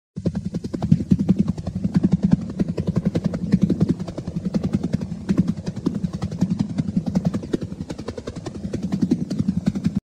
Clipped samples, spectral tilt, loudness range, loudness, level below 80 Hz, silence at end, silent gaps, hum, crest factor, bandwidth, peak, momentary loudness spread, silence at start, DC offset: under 0.1%; -8.5 dB/octave; 4 LU; -23 LUFS; -42 dBFS; 0.05 s; none; none; 22 dB; 9.8 kHz; 0 dBFS; 9 LU; 0.15 s; 0.1%